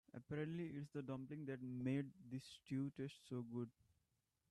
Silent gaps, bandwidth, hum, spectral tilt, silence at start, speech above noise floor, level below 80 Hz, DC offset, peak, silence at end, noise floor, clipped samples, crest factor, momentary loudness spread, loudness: none; 12.5 kHz; none; -7.5 dB/octave; 0.15 s; 39 dB; -82 dBFS; under 0.1%; -32 dBFS; 0.8 s; -87 dBFS; under 0.1%; 16 dB; 9 LU; -49 LUFS